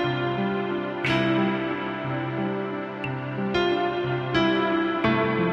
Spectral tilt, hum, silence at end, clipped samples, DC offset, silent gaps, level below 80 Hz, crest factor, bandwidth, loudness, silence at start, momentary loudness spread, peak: -7.5 dB/octave; none; 0 s; under 0.1%; under 0.1%; none; -54 dBFS; 16 dB; 7.6 kHz; -25 LUFS; 0 s; 7 LU; -10 dBFS